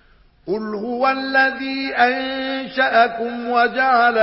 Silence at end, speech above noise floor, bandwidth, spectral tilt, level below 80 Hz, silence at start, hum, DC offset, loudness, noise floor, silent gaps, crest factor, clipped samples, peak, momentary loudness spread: 0 s; 20 dB; 5.8 kHz; -8 dB/octave; -58 dBFS; 0.45 s; none; under 0.1%; -18 LUFS; -38 dBFS; none; 16 dB; under 0.1%; -2 dBFS; 10 LU